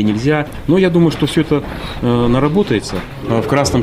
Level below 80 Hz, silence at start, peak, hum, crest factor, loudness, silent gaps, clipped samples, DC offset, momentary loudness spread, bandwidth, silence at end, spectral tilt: -32 dBFS; 0 s; -2 dBFS; none; 12 dB; -15 LUFS; none; under 0.1%; under 0.1%; 7 LU; 15.5 kHz; 0 s; -6.5 dB/octave